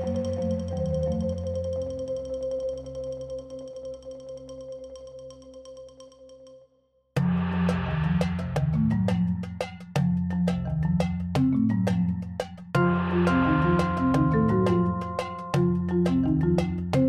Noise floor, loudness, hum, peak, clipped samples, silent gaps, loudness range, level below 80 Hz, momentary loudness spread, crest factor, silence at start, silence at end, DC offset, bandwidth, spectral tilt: -67 dBFS; -26 LUFS; none; -10 dBFS; under 0.1%; none; 15 LU; -44 dBFS; 18 LU; 16 dB; 0 s; 0 s; under 0.1%; 10 kHz; -8 dB/octave